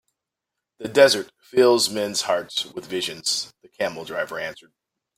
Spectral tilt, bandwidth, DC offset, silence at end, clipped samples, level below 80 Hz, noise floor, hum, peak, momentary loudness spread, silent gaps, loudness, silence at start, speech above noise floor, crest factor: -2.5 dB/octave; 16 kHz; under 0.1%; 0.65 s; under 0.1%; -66 dBFS; -84 dBFS; none; -2 dBFS; 13 LU; none; -22 LUFS; 0.8 s; 62 dB; 22 dB